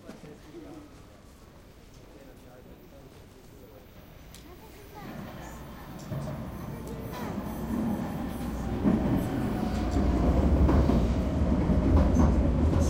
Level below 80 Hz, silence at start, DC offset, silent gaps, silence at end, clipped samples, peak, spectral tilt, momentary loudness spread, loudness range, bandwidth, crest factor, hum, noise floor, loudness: -34 dBFS; 0.05 s; under 0.1%; none; 0 s; under 0.1%; -12 dBFS; -8 dB/octave; 26 LU; 24 LU; 16 kHz; 18 dB; none; -51 dBFS; -28 LUFS